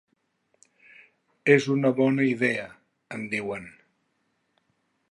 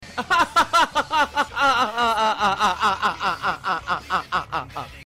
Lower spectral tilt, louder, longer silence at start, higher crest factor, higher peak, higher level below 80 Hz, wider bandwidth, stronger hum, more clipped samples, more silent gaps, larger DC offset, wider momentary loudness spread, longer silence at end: first, -6.5 dB/octave vs -2.5 dB/octave; second, -24 LUFS vs -21 LUFS; first, 1.45 s vs 0 s; first, 24 dB vs 12 dB; first, -4 dBFS vs -10 dBFS; second, -72 dBFS vs -50 dBFS; second, 11 kHz vs 16 kHz; neither; neither; neither; neither; first, 17 LU vs 7 LU; first, 1.4 s vs 0 s